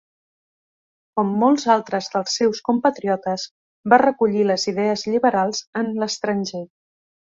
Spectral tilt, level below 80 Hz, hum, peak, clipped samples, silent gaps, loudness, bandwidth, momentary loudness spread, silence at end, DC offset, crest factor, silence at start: -4.5 dB/octave; -66 dBFS; none; -2 dBFS; under 0.1%; 3.51-3.84 s, 5.67-5.73 s; -20 LUFS; 7.8 kHz; 12 LU; 0.75 s; under 0.1%; 20 dB; 1.15 s